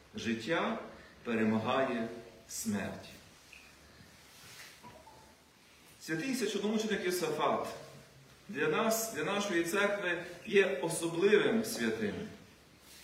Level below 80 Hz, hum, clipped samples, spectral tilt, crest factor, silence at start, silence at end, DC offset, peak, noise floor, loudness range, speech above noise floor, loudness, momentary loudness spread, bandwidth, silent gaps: -70 dBFS; none; under 0.1%; -4 dB/octave; 20 dB; 0.15 s; 0 s; under 0.1%; -14 dBFS; -61 dBFS; 13 LU; 28 dB; -33 LUFS; 22 LU; 16 kHz; none